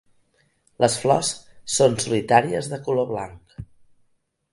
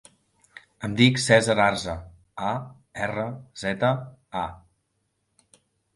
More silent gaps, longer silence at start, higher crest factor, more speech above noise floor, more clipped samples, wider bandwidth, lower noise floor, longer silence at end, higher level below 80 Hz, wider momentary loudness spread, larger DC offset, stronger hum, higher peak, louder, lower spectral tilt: neither; about the same, 0.8 s vs 0.8 s; about the same, 22 dB vs 24 dB; second, 46 dB vs 51 dB; neither; about the same, 11.5 kHz vs 11.5 kHz; second, -67 dBFS vs -74 dBFS; second, 0.9 s vs 1.4 s; about the same, -56 dBFS vs -52 dBFS; about the same, 18 LU vs 16 LU; neither; neither; about the same, -2 dBFS vs -2 dBFS; first, -21 LUFS vs -24 LUFS; about the same, -4 dB/octave vs -5 dB/octave